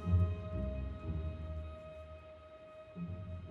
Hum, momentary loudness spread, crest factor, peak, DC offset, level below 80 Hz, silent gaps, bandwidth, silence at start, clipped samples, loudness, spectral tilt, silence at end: none; 18 LU; 18 dB; -22 dBFS; under 0.1%; -46 dBFS; none; 4.3 kHz; 0 s; under 0.1%; -41 LUFS; -10 dB/octave; 0 s